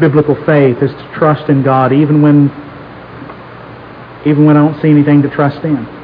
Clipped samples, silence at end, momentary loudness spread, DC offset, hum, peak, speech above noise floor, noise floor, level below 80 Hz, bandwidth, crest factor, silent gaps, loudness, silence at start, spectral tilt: 0.5%; 0 s; 23 LU; under 0.1%; none; 0 dBFS; 22 dB; -31 dBFS; -48 dBFS; 5 kHz; 10 dB; none; -10 LUFS; 0 s; -11.5 dB/octave